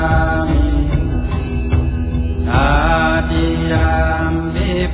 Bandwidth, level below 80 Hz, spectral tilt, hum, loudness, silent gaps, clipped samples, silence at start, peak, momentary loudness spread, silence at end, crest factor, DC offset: 4 kHz; -18 dBFS; -11 dB/octave; none; -16 LUFS; none; under 0.1%; 0 s; -2 dBFS; 6 LU; 0 s; 14 dB; under 0.1%